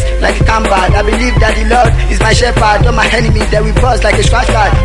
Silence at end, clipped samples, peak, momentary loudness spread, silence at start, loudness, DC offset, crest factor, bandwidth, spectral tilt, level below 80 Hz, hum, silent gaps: 0 s; under 0.1%; 0 dBFS; 2 LU; 0 s; -10 LUFS; under 0.1%; 8 dB; 11.5 kHz; -5 dB/octave; -12 dBFS; none; none